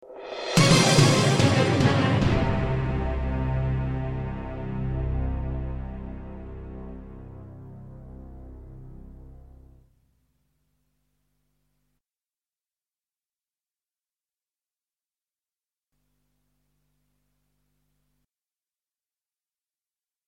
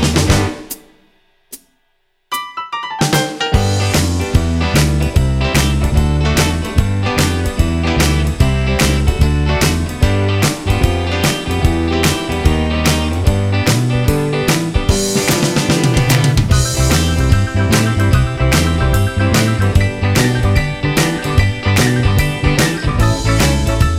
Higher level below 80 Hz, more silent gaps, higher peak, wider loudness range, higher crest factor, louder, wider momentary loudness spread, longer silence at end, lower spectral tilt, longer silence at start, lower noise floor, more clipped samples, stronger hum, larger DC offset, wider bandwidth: second, -38 dBFS vs -20 dBFS; neither; second, -4 dBFS vs 0 dBFS; first, 25 LU vs 3 LU; first, 24 dB vs 14 dB; second, -23 LUFS vs -14 LUFS; first, 26 LU vs 3 LU; first, 10.95 s vs 0 s; about the same, -5 dB/octave vs -5 dB/octave; about the same, 0.05 s vs 0 s; first, under -90 dBFS vs -62 dBFS; neither; neither; neither; about the same, 15.5 kHz vs 16.5 kHz